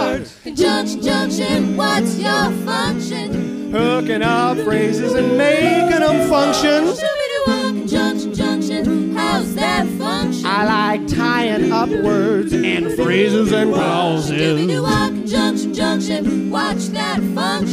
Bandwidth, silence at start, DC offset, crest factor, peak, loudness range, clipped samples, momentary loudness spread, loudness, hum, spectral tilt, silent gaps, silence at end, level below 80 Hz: 15.5 kHz; 0 s; under 0.1%; 14 dB; -2 dBFS; 3 LU; under 0.1%; 5 LU; -17 LUFS; none; -5 dB/octave; none; 0 s; -42 dBFS